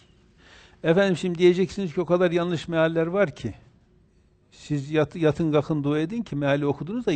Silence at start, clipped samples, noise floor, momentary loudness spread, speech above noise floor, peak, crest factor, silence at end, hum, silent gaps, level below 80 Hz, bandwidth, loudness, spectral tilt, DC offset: 0.85 s; under 0.1%; -60 dBFS; 8 LU; 37 dB; -6 dBFS; 18 dB; 0 s; none; none; -54 dBFS; 8.8 kHz; -24 LUFS; -7 dB/octave; under 0.1%